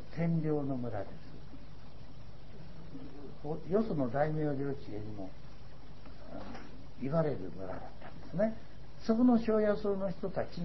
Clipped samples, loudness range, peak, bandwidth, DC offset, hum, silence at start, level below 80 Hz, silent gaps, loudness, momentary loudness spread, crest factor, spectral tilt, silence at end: under 0.1%; 8 LU; -16 dBFS; 6 kHz; 1%; none; 0 s; -56 dBFS; none; -34 LUFS; 23 LU; 18 dB; -8 dB/octave; 0 s